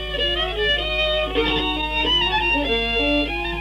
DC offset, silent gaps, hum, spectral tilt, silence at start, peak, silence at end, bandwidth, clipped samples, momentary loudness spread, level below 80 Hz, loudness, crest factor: under 0.1%; none; none; -4.5 dB/octave; 0 s; -6 dBFS; 0 s; 15 kHz; under 0.1%; 4 LU; -32 dBFS; -19 LUFS; 14 dB